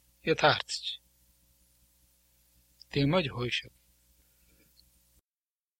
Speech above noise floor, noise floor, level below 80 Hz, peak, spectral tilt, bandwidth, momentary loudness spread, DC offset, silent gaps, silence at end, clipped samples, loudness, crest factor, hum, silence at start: over 61 dB; under -90 dBFS; -60 dBFS; -10 dBFS; -5 dB/octave; 16.5 kHz; 11 LU; under 0.1%; none; 2.1 s; under 0.1%; -29 LUFS; 26 dB; 60 Hz at -60 dBFS; 0.25 s